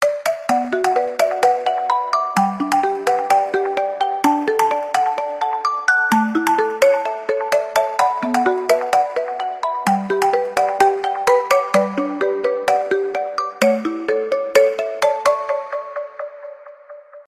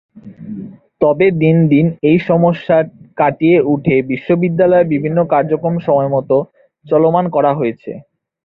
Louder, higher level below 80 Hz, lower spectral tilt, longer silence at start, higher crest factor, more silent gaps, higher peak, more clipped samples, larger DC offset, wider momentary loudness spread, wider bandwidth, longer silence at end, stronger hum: second, -18 LUFS vs -14 LUFS; second, -64 dBFS vs -52 dBFS; second, -4 dB/octave vs -11 dB/octave; second, 0 s vs 0.25 s; first, 18 dB vs 12 dB; neither; about the same, 0 dBFS vs -2 dBFS; neither; neither; second, 7 LU vs 17 LU; first, 15.5 kHz vs 4.6 kHz; second, 0.05 s vs 0.45 s; neither